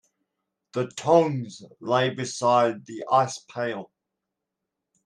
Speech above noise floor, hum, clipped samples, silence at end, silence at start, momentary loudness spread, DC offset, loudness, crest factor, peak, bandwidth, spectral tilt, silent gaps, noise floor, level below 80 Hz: 60 dB; none; under 0.1%; 1.2 s; 0.75 s; 15 LU; under 0.1%; -24 LUFS; 20 dB; -6 dBFS; 11 kHz; -5 dB/octave; none; -84 dBFS; -72 dBFS